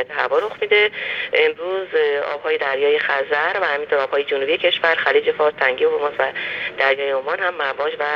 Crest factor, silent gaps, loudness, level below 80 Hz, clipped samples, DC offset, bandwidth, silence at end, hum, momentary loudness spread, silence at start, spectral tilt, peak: 16 dB; none; -19 LUFS; -66 dBFS; under 0.1%; under 0.1%; 6.6 kHz; 0 s; none; 6 LU; 0 s; -4 dB/octave; -4 dBFS